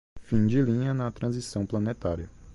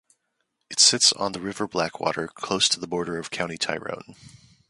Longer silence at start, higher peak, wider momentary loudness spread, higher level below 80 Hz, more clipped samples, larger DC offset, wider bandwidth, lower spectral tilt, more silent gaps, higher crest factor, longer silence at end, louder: second, 0.15 s vs 0.7 s; second, -12 dBFS vs -4 dBFS; second, 8 LU vs 14 LU; first, -46 dBFS vs -62 dBFS; neither; neither; about the same, 11.5 kHz vs 11.5 kHz; first, -7.5 dB/octave vs -1.5 dB/octave; neither; second, 16 dB vs 24 dB; second, 0 s vs 0.4 s; second, -28 LUFS vs -22 LUFS